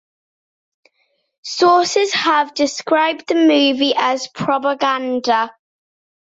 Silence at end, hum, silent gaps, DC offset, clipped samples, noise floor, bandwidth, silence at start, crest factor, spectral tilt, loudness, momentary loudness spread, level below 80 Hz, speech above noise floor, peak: 0.7 s; none; none; under 0.1%; under 0.1%; -66 dBFS; 8 kHz; 1.45 s; 14 dB; -3 dB/octave; -16 LUFS; 7 LU; -66 dBFS; 50 dB; -2 dBFS